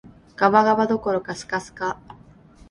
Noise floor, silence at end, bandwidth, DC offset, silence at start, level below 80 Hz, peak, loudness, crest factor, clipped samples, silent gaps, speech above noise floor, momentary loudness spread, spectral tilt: -49 dBFS; 0.55 s; 11.5 kHz; under 0.1%; 0.4 s; -56 dBFS; -2 dBFS; -21 LUFS; 20 dB; under 0.1%; none; 28 dB; 12 LU; -5.5 dB/octave